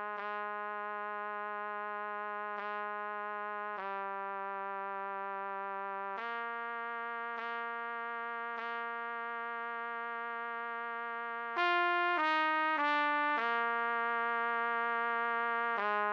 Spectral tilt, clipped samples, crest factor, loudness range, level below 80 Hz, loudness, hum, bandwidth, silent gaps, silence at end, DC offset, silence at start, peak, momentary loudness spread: -4.5 dB/octave; under 0.1%; 16 dB; 8 LU; under -90 dBFS; -36 LUFS; none; 7.2 kHz; none; 0 s; under 0.1%; 0 s; -20 dBFS; 9 LU